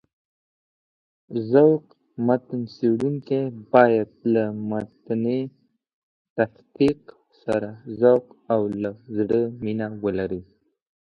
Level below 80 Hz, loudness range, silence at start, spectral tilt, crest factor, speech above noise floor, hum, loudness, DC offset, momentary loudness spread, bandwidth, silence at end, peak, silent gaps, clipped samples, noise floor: -60 dBFS; 5 LU; 1.3 s; -9 dB/octave; 24 dB; over 68 dB; none; -23 LUFS; under 0.1%; 14 LU; 8.8 kHz; 0.6 s; 0 dBFS; 5.93-6.36 s; under 0.1%; under -90 dBFS